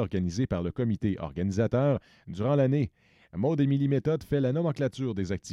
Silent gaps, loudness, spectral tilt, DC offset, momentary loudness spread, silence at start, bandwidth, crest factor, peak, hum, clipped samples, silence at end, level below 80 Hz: none; -28 LUFS; -8 dB/octave; under 0.1%; 7 LU; 0 s; 8.2 kHz; 16 dB; -12 dBFS; none; under 0.1%; 0 s; -52 dBFS